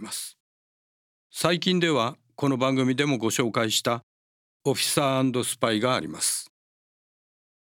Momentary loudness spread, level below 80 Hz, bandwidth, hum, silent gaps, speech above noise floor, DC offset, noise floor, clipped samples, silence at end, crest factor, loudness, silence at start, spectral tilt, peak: 9 LU; -72 dBFS; 18 kHz; none; 0.40-1.30 s, 4.03-4.60 s; over 66 dB; under 0.1%; under -90 dBFS; under 0.1%; 1.2 s; 22 dB; -25 LUFS; 0 s; -4 dB/octave; -6 dBFS